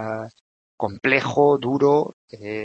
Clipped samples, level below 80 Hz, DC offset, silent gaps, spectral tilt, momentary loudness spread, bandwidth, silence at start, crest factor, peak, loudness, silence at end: under 0.1%; -66 dBFS; under 0.1%; 0.41-0.78 s, 2.13-2.28 s; -6.5 dB/octave; 14 LU; 7.6 kHz; 0 s; 20 dB; -2 dBFS; -20 LUFS; 0 s